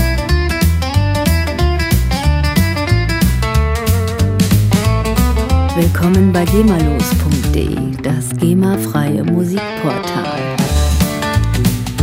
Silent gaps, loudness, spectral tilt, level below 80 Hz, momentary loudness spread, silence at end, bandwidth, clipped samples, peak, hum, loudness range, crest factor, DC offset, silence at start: none; -14 LUFS; -6 dB/octave; -20 dBFS; 6 LU; 0 s; 16.5 kHz; under 0.1%; 0 dBFS; none; 3 LU; 14 dB; under 0.1%; 0 s